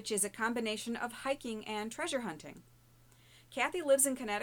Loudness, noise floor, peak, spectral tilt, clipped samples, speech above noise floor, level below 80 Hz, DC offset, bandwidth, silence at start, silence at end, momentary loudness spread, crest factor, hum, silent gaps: -34 LUFS; -63 dBFS; -16 dBFS; -2 dB/octave; under 0.1%; 28 dB; -68 dBFS; under 0.1%; 19.5 kHz; 0 s; 0 s; 14 LU; 20 dB; none; none